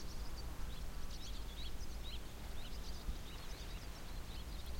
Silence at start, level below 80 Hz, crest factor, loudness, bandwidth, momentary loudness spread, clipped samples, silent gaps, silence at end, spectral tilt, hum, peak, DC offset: 0 s; -46 dBFS; 12 dB; -50 LUFS; 16.5 kHz; 2 LU; under 0.1%; none; 0 s; -4 dB/octave; none; -32 dBFS; under 0.1%